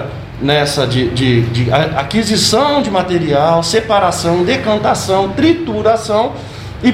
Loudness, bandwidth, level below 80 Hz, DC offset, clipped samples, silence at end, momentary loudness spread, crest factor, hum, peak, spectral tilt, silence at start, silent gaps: -13 LUFS; 16 kHz; -36 dBFS; under 0.1%; under 0.1%; 0 s; 4 LU; 14 dB; none; 0 dBFS; -5 dB/octave; 0 s; none